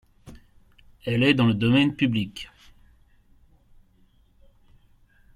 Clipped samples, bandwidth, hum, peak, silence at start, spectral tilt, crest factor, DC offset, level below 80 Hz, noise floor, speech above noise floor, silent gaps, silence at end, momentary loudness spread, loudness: under 0.1%; 12 kHz; none; -6 dBFS; 0.25 s; -7 dB/octave; 22 dB; under 0.1%; -54 dBFS; -59 dBFS; 38 dB; none; 2.9 s; 18 LU; -22 LUFS